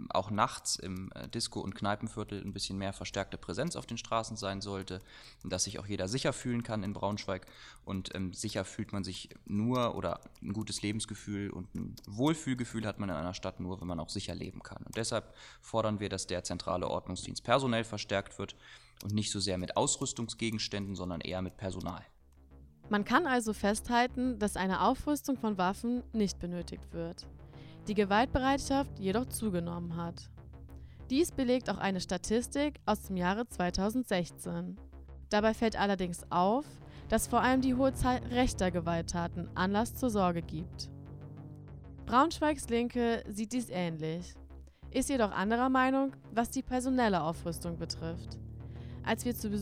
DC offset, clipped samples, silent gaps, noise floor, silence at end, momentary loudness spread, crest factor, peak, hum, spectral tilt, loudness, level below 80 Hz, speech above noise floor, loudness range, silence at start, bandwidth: under 0.1%; under 0.1%; none; -58 dBFS; 0 s; 15 LU; 22 dB; -12 dBFS; none; -4.5 dB/octave; -34 LUFS; -52 dBFS; 24 dB; 6 LU; 0 s; 16 kHz